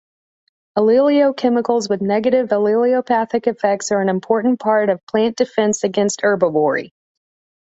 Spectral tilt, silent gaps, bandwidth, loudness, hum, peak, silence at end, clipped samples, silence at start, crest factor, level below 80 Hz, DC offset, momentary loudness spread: -5 dB/octave; 5.03-5.07 s; 8 kHz; -17 LUFS; none; -2 dBFS; 0.8 s; under 0.1%; 0.75 s; 16 dB; -62 dBFS; under 0.1%; 4 LU